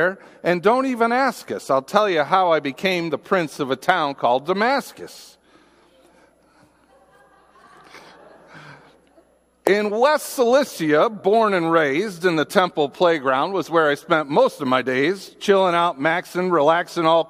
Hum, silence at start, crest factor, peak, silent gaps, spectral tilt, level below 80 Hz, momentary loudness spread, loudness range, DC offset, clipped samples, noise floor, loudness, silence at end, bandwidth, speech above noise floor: none; 0 s; 20 dB; 0 dBFS; none; -5 dB/octave; -68 dBFS; 5 LU; 7 LU; under 0.1%; under 0.1%; -57 dBFS; -19 LUFS; 0.05 s; 15.5 kHz; 38 dB